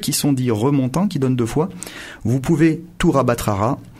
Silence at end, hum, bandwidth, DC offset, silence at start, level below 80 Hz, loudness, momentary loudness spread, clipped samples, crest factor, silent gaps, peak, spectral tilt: 0 s; none; 16 kHz; under 0.1%; 0 s; -40 dBFS; -19 LUFS; 7 LU; under 0.1%; 14 dB; none; -4 dBFS; -6 dB/octave